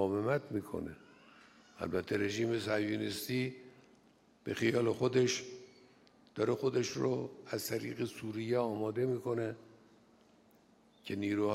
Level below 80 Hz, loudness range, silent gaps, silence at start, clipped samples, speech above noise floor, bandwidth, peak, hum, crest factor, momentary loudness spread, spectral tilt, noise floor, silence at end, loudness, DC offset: -70 dBFS; 3 LU; none; 0 s; under 0.1%; 31 dB; 16 kHz; -18 dBFS; none; 18 dB; 14 LU; -5.5 dB/octave; -66 dBFS; 0 s; -36 LUFS; under 0.1%